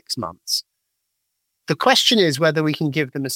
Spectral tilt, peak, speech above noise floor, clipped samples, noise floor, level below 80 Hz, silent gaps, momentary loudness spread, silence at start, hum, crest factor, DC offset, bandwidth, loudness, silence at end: -3.5 dB/octave; -2 dBFS; 56 dB; under 0.1%; -76 dBFS; -66 dBFS; none; 13 LU; 0.1 s; none; 20 dB; under 0.1%; 17 kHz; -18 LUFS; 0 s